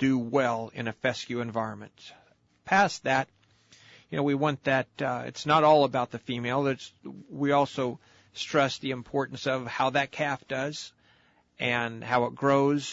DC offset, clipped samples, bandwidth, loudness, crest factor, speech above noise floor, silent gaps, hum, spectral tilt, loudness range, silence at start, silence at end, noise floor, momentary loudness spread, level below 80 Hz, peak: under 0.1%; under 0.1%; 8 kHz; -27 LUFS; 18 dB; 36 dB; none; none; -5.5 dB/octave; 4 LU; 0 s; 0 s; -64 dBFS; 13 LU; -68 dBFS; -10 dBFS